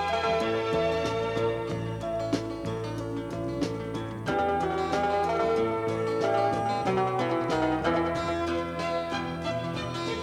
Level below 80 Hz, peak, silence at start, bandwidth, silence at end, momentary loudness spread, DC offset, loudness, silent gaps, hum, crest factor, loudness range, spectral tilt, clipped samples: -50 dBFS; -14 dBFS; 0 s; 14.5 kHz; 0 s; 7 LU; under 0.1%; -29 LUFS; none; none; 14 dB; 4 LU; -6 dB/octave; under 0.1%